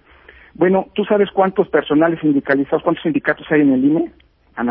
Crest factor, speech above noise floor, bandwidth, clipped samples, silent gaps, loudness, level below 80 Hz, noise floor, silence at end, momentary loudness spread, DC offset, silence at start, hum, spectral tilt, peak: 16 dB; 30 dB; 4.4 kHz; under 0.1%; none; -16 LUFS; -52 dBFS; -45 dBFS; 0 s; 5 LU; under 0.1%; 0.6 s; none; -11.5 dB/octave; -2 dBFS